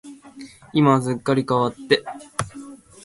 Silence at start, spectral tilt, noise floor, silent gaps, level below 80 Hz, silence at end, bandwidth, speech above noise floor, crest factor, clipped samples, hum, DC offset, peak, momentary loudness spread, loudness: 0.05 s; -6 dB/octave; -42 dBFS; none; -56 dBFS; 0.3 s; 11.5 kHz; 23 dB; 22 dB; under 0.1%; none; under 0.1%; 0 dBFS; 24 LU; -21 LUFS